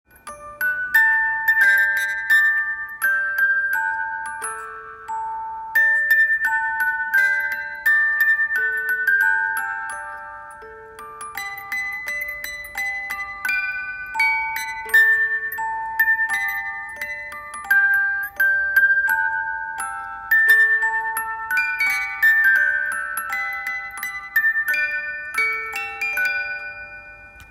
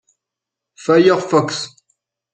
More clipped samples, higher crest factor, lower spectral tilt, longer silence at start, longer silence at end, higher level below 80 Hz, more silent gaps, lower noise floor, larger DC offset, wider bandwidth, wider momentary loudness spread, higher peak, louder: neither; about the same, 16 dB vs 16 dB; second, 0 dB/octave vs -5 dB/octave; second, 0.25 s vs 0.8 s; second, 0.05 s vs 0.65 s; about the same, -58 dBFS vs -62 dBFS; neither; second, -42 dBFS vs -84 dBFS; neither; first, 16.5 kHz vs 9.4 kHz; about the same, 15 LU vs 15 LU; about the same, -4 dBFS vs -2 dBFS; second, -19 LUFS vs -16 LUFS